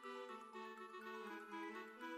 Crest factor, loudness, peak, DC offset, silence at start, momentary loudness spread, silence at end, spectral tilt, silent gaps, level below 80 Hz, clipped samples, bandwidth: 12 dB; -52 LUFS; -40 dBFS; under 0.1%; 0 s; 3 LU; 0 s; -4 dB/octave; none; under -90 dBFS; under 0.1%; 16.5 kHz